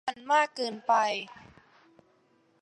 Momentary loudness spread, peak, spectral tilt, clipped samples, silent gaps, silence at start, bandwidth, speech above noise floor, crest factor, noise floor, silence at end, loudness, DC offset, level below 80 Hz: 10 LU; -12 dBFS; -2.5 dB/octave; under 0.1%; none; 0.05 s; 11 kHz; 39 dB; 20 dB; -67 dBFS; 1.3 s; -28 LUFS; under 0.1%; -76 dBFS